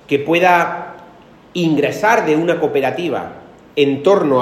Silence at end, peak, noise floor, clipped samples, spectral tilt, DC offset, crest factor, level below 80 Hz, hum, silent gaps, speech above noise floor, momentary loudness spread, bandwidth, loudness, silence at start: 0 s; 0 dBFS; -42 dBFS; under 0.1%; -5.5 dB/octave; under 0.1%; 16 dB; -58 dBFS; none; none; 28 dB; 13 LU; 15 kHz; -15 LUFS; 0.1 s